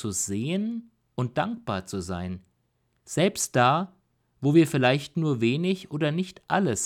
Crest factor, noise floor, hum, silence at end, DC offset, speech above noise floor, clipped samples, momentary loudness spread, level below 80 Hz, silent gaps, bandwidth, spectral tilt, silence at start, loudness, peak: 18 dB; -72 dBFS; none; 0 s; under 0.1%; 46 dB; under 0.1%; 12 LU; -60 dBFS; none; 16 kHz; -5 dB/octave; 0 s; -26 LUFS; -8 dBFS